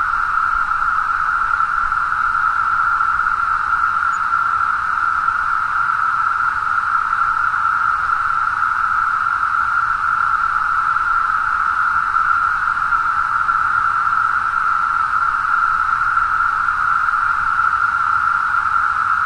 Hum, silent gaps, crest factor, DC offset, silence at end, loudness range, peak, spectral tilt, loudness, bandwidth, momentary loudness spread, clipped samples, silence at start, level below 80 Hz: none; none; 12 dB; under 0.1%; 0 s; 1 LU; -4 dBFS; -2.5 dB/octave; -16 LUFS; 10.5 kHz; 1 LU; under 0.1%; 0 s; -42 dBFS